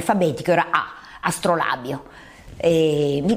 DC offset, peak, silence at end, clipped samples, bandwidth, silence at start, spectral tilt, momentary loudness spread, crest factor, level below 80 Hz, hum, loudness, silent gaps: under 0.1%; -2 dBFS; 0 s; under 0.1%; 15.5 kHz; 0 s; -5.5 dB/octave; 10 LU; 18 dB; -50 dBFS; none; -21 LUFS; none